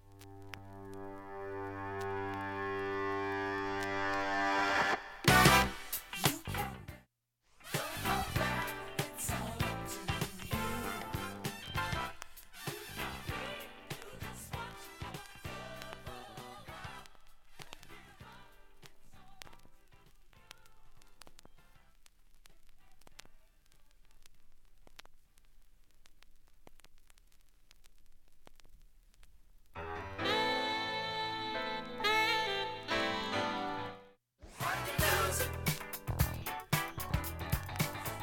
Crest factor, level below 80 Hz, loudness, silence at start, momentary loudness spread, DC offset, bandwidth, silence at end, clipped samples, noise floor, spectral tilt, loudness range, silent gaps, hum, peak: 26 dB; -52 dBFS; -35 LUFS; 0.05 s; 20 LU; under 0.1%; 17.5 kHz; 0 s; under 0.1%; -75 dBFS; -3.5 dB/octave; 19 LU; none; none; -12 dBFS